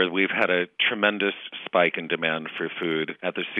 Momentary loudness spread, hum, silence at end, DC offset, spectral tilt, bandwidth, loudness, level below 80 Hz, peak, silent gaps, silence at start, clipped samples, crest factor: 8 LU; none; 0 s; under 0.1%; -6.5 dB/octave; 6.2 kHz; -24 LUFS; -78 dBFS; -6 dBFS; none; 0 s; under 0.1%; 20 dB